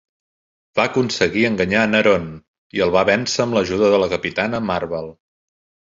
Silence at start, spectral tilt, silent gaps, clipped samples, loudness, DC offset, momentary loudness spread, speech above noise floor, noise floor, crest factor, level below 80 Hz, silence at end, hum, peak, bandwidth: 0.75 s; -4.5 dB/octave; 2.48-2.70 s; under 0.1%; -18 LUFS; under 0.1%; 10 LU; over 72 dB; under -90 dBFS; 18 dB; -48 dBFS; 0.85 s; none; -2 dBFS; 7.8 kHz